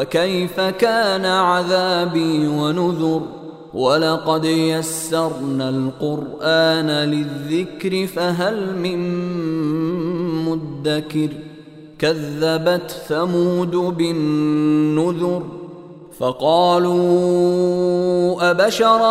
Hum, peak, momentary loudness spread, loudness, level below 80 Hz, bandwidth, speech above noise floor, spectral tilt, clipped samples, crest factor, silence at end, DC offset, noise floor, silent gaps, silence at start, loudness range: none; -2 dBFS; 8 LU; -18 LUFS; -56 dBFS; 16 kHz; 22 dB; -5.5 dB/octave; under 0.1%; 16 dB; 0 s; under 0.1%; -39 dBFS; none; 0 s; 4 LU